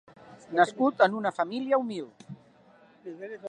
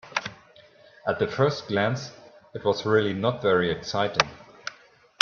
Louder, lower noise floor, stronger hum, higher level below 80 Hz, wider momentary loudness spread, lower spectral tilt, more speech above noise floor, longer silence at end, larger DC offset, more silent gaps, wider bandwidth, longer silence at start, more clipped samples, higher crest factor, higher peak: about the same, -26 LUFS vs -25 LUFS; about the same, -58 dBFS vs -55 dBFS; neither; second, -80 dBFS vs -62 dBFS; first, 24 LU vs 16 LU; about the same, -5.5 dB/octave vs -5 dB/octave; about the same, 31 dB vs 30 dB; second, 0 s vs 0.5 s; neither; neither; first, 10 kHz vs 7.2 kHz; first, 0.25 s vs 0.05 s; neither; about the same, 22 dB vs 26 dB; second, -6 dBFS vs 0 dBFS